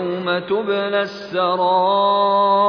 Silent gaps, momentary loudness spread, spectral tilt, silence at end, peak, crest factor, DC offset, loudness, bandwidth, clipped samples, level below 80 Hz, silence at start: none; 6 LU; -6.5 dB/octave; 0 s; -6 dBFS; 12 dB; under 0.1%; -18 LUFS; 5.4 kHz; under 0.1%; -66 dBFS; 0 s